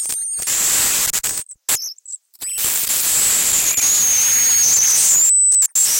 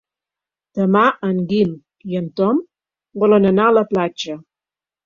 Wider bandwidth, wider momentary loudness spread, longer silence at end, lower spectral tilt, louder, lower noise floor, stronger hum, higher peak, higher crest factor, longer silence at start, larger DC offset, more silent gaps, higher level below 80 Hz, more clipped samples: first, 17.5 kHz vs 7.4 kHz; second, 12 LU vs 15 LU; second, 0 s vs 0.65 s; second, 2 dB/octave vs -7 dB/octave; first, -13 LUFS vs -17 LUFS; second, -36 dBFS vs -90 dBFS; neither; about the same, -4 dBFS vs -2 dBFS; about the same, 12 dB vs 16 dB; second, 0 s vs 0.75 s; neither; neither; first, -52 dBFS vs -58 dBFS; neither